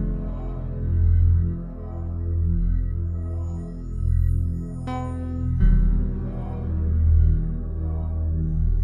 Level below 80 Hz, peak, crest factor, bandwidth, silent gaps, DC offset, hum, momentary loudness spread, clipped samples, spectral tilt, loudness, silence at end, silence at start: -24 dBFS; -8 dBFS; 14 dB; 3.2 kHz; none; under 0.1%; none; 11 LU; under 0.1%; -10.5 dB/octave; -25 LUFS; 0 s; 0 s